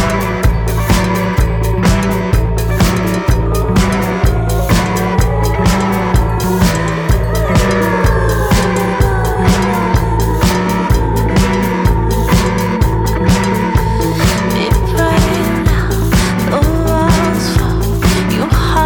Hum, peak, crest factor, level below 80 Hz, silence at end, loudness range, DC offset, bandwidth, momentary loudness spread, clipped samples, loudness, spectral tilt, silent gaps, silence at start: none; -2 dBFS; 10 dB; -18 dBFS; 0 s; 1 LU; under 0.1%; over 20 kHz; 2 LU; under 0.1%; -13 LUFS; -6 dB/octave; none; 0 s